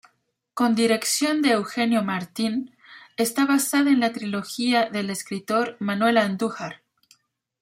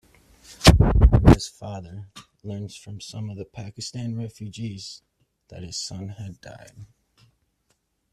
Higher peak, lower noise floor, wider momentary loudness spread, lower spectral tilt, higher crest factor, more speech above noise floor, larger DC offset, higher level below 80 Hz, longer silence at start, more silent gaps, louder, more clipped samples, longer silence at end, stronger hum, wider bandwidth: second, -6 dBFS vs 0 dBFS; about the same, -71 dBFS vs -71 dBFS; second, 10 LU vs 25 LU; second, -3.5 dB/octave vs -5.5 dB/octave; about the same, 18 dB vs 22 dB; first, 48 dB vs 37 dB; neither; second, -72 dBFS vs -28 dBFS; about the same, 0.55 s vs 0.5 s; neither; about the same, -23 LUFS vs -21 LUFS; neither; second, 0.85 s vs 1.3 s; neither; first, 16 kHz vs 14 kHz